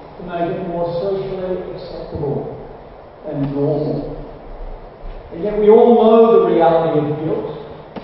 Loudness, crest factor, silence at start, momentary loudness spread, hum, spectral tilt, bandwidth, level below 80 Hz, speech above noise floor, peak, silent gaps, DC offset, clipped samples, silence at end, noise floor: -16 LUFS; 16 dB; 0 s; 25 LU; none; -12.5 dB/octave; 5.6 kHz; -40 dBFS; 22 dB; 0 dBFS; none; under 0.1%; under 0.1%; 0 s; -37 dBFS